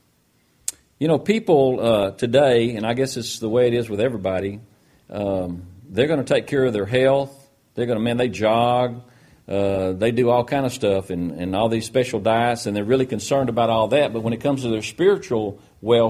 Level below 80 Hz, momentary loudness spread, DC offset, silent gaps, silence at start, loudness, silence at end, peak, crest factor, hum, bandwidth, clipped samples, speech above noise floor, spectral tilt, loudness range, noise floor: -54 dBFS; 10 LU; under 0.1%; none; 0.7 s; -21 LUFS; 0 s; -4 dBFS; 16 dB; none; 14.5 kHz; under 0.1%; 42 dB; -5.5 dB/octave; 3 LU; -62 dBFS